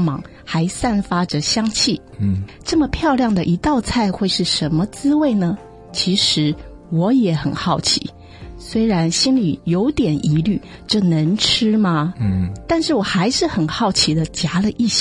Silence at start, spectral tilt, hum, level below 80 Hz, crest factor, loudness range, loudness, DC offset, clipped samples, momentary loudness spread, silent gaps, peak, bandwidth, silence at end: 0 s; -5 dB/octave; none; -40 dBFS; 16 dB; 1 LU; -18 LUFS; under 0.1%; under 0.1%; 7 LU; none; -2 dBFS; 11.5 kHz; 0 s